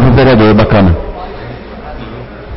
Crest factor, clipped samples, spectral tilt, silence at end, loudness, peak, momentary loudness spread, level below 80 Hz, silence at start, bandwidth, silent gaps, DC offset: 10 dB; under 0.1%; -12.5 dB/octave; 0 s; -8 LUFS; 0 dBFS; 20 LU; -22 dBFS; 0 s; 5.8 kHz; none; under 0.1%